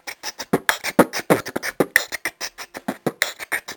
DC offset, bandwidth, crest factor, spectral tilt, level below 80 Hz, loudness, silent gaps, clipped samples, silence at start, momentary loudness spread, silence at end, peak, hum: under 0.1%; 19.5 kHz; 24 dB; -3.5 dB/octave; -58 dBFS; -22 LUFS; none; under 0.1%; 0.05 s; 12 LU; 0 s; 0 dBFS; none